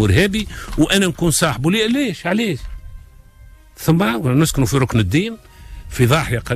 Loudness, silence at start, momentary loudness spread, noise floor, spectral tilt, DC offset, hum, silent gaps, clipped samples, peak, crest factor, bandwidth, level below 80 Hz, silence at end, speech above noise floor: -17 LUFS; 0 s; 11 LU; -43 dBFS; -5 dB/octave; under 0.1%; none; none; under 0.1%; -4 dBFS; 14 dB; 15.5 kHz; -34 dBFS; 0 s; 27 dB